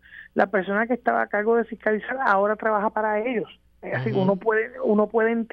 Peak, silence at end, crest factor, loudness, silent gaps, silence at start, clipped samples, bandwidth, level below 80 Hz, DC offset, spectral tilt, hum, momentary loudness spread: -4 dBFS; 0.1 s; 18 dB; -23 LUFS; none; 0.1 s; under 0.1%; 5.6 kHz; -62 dBFS; under 0.1%; -9 dB/octave; none; 7 LU